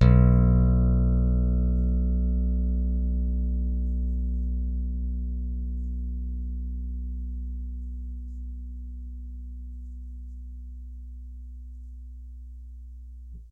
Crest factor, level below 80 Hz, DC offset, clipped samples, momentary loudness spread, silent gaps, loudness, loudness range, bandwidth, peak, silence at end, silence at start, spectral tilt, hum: 20 dB; -28 dBFS; under 0.1%; under 0.1%; 21 LU; none; -27 LUFS; 17 LU; 4 kHz; -6 dBFS; 0.05 s; 0 s; -11 dB/octave; none